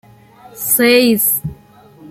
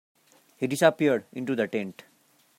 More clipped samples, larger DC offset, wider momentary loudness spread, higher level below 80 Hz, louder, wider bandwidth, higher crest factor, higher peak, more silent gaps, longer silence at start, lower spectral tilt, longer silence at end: neither; neither; about the same, 13 LU vs 12 LU; first, -50 dBFS vs -76 dBFS; first, -12 LUFS vs -26 LUFS; about the same, 16 kHz vs 16 kHz; second, 16 dB vs 22 dB; first, 0 dBFS vs -6 dBFS; neither; about the same, 0.55 s vs 0.6 s; second, -3 dB/octave vs -5.5 dB/octave; second, 0 s vs 0.65 s